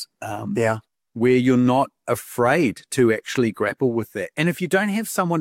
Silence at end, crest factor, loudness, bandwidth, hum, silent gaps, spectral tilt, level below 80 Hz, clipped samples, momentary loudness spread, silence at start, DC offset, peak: 0 s; 14 dB; -21 LUFS; 17 kHz; none; none; -6 dB/octave; -62 dBFS; under 0.1%; 9 LU; 0 s; under 0.1%; -6 dBFS